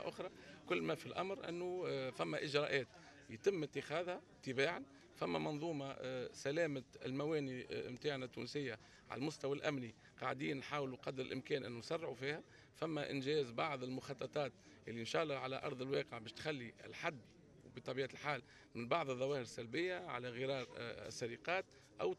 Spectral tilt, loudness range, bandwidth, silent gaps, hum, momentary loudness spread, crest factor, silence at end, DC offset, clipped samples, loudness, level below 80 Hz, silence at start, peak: -5 dB/octave; 3 LU; 13 kHz; none; none; 9 LU; 22 dB; 0 s; under 0.1%; under 0.1%; -43 LUFS; -78 dBFS; 0 s; -22 dBFS